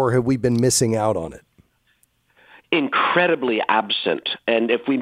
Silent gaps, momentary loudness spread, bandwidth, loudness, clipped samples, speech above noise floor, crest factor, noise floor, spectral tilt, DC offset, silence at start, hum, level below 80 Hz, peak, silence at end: none; 6 LU; 16 kHz; -20 LUFS; under 0.1%; 44 dB; 20 dB; -63 dBFS; -4 dB/octave; under 0.1%; 0 s; none; -54 dBFS; -2 dBFS; 0 s